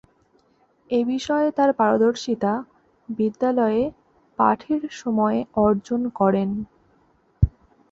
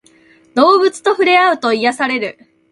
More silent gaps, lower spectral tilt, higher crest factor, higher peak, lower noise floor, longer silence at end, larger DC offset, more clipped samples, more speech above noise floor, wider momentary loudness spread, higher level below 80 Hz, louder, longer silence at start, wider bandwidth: neither; first, -7 dB/octave vs -3 dB/octave; about the same, 18 dB vs 14 dB; second, -4 dBFS vs 0 dBFS; first, -62 dBFS vs -49 dBFS; about the same, 0.4 s vs 0.4 s; neither; neither; first, 41 dB vs 36 dB; about the same, 8 LU vs 10 LU; first, -40 dBFS vs -64 dBFS; second, -22 LUFS vs -13 LUFS; first, 0.9 s vs 0.55 s; second, 7.8 kHz vs 11.5 kHz